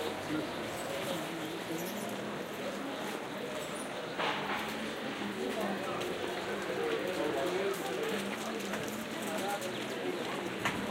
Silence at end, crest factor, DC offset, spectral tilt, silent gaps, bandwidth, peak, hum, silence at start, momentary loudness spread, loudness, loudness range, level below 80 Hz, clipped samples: 0 s; 20 dB; under 0.1%; -4 dB/octave; none; 16.5 kHz; -18 dBFS; none; 0 s; 5 LU; -36 LUFS; 3 LU; -68 dBFS; under 0.1%